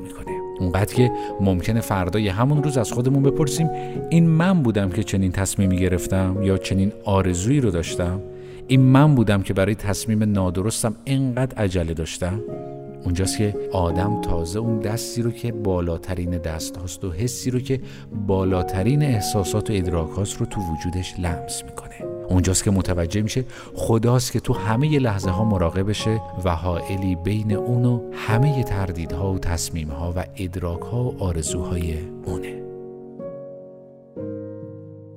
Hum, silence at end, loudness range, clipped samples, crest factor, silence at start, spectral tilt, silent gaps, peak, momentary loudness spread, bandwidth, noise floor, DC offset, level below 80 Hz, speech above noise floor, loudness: none; 0 s; 6 LU; under 0.1%; 20 dB; 0 s; -6 dB/octave; none; -2 dBFS; 12 LU; 16 kHz; -44 dBFS; under 0.1%; -38 dBFS; 23 dB; -22 LUFS